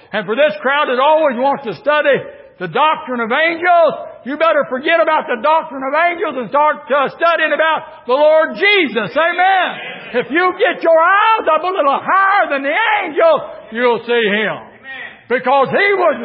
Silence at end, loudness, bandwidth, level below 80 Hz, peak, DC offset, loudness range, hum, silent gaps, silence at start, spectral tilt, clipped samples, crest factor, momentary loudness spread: 0 s; -14 LUFS; 5.8 kHz; -66 dBFS; -2 dBFS; under 0.1%; 2 LU; none; none; 0.1 s; -9.5 dB/octave; under 0.1%; 12 dB; 9 LU